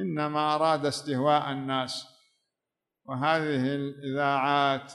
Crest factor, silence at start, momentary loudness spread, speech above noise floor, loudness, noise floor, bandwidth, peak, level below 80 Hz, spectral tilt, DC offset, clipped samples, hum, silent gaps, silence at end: 16 dB; 0 s; 8 LU; 60 dB; -27 LUFS; -88 dBFS; 12 kHz; -12 dBFS; -76 dBFS; -5.5 dB/octave; under 0.1%; under 0.1%; none; none; 0 s